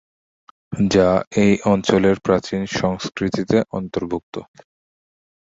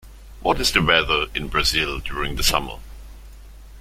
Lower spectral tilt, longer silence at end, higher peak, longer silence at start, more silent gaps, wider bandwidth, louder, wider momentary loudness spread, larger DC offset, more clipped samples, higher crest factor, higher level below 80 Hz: first, -6 dB/octave vs -2.5 dB/octave; first, 1.05 s vs 0 s; about the same, -2 dBFS vs -2 dBFS; first, 0.7 s vs 0.05 s; first, 1.27-1.31 s, 4.23-4.32 s vs none; second, 7.8 kHz vs 16.5 kHz; about the same, -19 LUFS vs -20 LUFS; about the same, 11 LU vs 10 LU; neither; neither; about the same, 18 dB vs 22 dB; second, -46 dBFS vs -34 dBFS